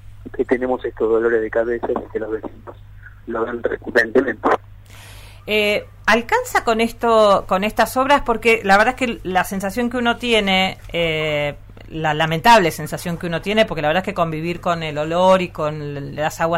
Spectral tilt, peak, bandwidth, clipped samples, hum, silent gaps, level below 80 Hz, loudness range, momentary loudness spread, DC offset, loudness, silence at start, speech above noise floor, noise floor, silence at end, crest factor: -4.5 dB/octave; -4 dBFS; 16 kHz; under 0.1%; none; none; -42 dBFS; 6 LU; 11 LU; under 0.1%; -18 LUFS; 0.05 s; 21 dB; -39 dBFS; 0 s; 16 dB